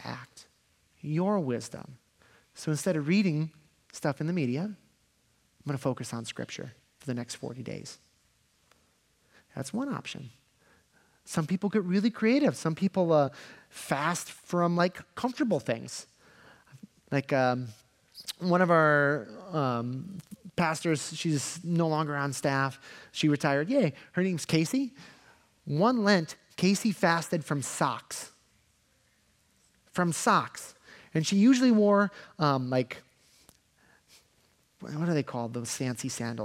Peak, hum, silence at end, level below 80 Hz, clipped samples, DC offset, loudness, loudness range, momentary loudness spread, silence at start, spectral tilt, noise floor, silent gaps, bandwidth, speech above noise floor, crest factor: -8 dBFS; none; 0 s; -74 dBFS; under 0.1%; under 0.1%; -29 LUFS; 11 LU; 17 LU; 0 s; -5.5 dB/octave; -69 dBFS; none; 16 kHz; 41 dB; 22 dB